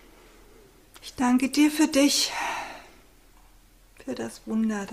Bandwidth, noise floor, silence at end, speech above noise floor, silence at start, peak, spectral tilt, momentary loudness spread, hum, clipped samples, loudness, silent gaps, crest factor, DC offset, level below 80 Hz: 16 kHz; -55 dBFS; 0 s; 31 dB; 0.95 s; -10 dBFS; -2.5 dB/octave; 21 LU; none; under 0.1%; -24 LUFS; none; 18 dB; under 0.1%; -56 dBFS